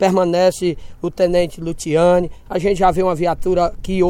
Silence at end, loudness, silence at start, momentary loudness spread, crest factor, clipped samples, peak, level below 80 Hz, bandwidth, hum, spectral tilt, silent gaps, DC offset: 0 s; -17 LUFS; 0 s; 9 LU; 14 dB; under 0.1%; -2 dBFS; -34 dBFS; 16 kHz; none; -6 dB/octave; none; under 0.1%